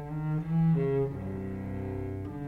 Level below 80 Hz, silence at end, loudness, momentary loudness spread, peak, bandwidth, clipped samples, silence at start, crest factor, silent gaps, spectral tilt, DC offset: -50 dBFS; 0 s; -31 LUFS; 10 LU; -18 dBFS; 3.7 kHz; under 0.1%; 0 s; 12 dB; none; -11 dB/octave; under 0.1%